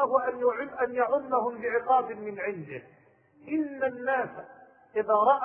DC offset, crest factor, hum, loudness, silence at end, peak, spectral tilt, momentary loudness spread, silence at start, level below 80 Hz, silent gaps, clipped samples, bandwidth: under 0.1%; 18 dB; none; -28 LUFS; 0 s; -10 dBFS; -9.5 dB/octave; 12 LU; 0 s; -72 dBFS; none; under 0.1%; 3.5 kHz